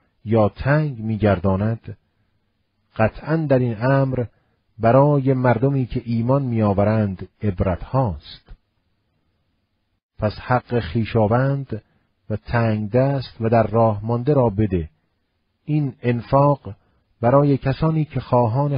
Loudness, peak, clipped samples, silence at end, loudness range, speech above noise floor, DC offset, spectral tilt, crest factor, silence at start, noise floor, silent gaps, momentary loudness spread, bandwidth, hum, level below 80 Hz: -20 LUFS; -2 dBFS; under 0.1%; 0 s; 6 LU; 51 dB; under 0.1%; -12.5 dB/octave; 18 dB; 0.25 s; -70 dBFS; 10.03-10.09 s; 10 LU; 5.4 kHz; none; -42 dBFS